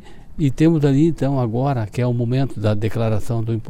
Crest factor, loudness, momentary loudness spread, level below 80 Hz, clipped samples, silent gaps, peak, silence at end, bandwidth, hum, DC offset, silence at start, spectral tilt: 14 dB; -19 LUFS; 7 LU; -38 dBFS; under 0.1%; none; -4 dBFS; 0 s; 13 kHz; none; under 0.1%; 0 s; -8.5 dB/octave